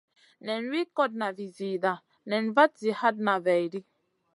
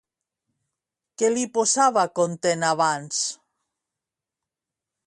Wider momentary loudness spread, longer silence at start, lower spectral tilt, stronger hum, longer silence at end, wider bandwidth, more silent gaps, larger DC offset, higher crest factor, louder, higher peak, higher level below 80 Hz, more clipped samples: first, 13 LU vs 7 LU; second, 0.45 s vs 1.2 s; first, -6 dB/octave vs -3 dB/octave; neither; second, 0.55 s vs 1.75 s; about the same, 11.5 kHz vs 11.5 kHz; neither; neither; about the same, 22 dB vs 20 dB; second, -28 LUFS vs -22 LUFS; about the same, -6 dBFS vs -6 dBFS; second, -84 dBFS vs -72 dBFS; neither